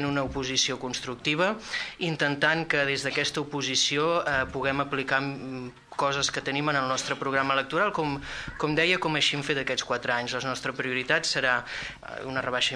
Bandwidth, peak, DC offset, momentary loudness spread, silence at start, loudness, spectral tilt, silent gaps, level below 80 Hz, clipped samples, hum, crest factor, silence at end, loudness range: 11 kHz; -6 dBFS; under 0.1%; 9 LU; 0 s; -26 LUFS; -3 dB/octave; none; -54 dBFS; under 0.1%; none; 20 dB; 0 s; 2 LU